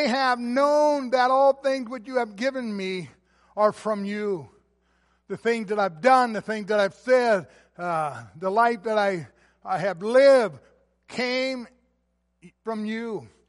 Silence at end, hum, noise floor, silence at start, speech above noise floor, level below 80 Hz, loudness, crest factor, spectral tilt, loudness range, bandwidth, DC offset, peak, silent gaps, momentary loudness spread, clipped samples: 0.25 s; none; -72 dBFS; 0 s; 49 dB; -70 dBFS; -24 LUFS; 18 dB; -5 dB/octave; 6 LU; 11.5 kHz; under 0.1%; -6 dBFS; none; 14 LU; under 0.1%